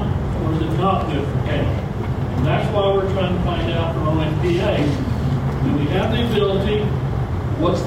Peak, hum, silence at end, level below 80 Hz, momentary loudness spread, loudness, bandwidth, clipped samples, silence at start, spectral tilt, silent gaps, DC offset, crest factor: -6 dBFS; none; 0 s; -30 dBFS; 4 LU; -20 LUFS; 13 kHz; under 0.1%; 0 s; -8 dB/octave; none; under 0.1%; 12 dB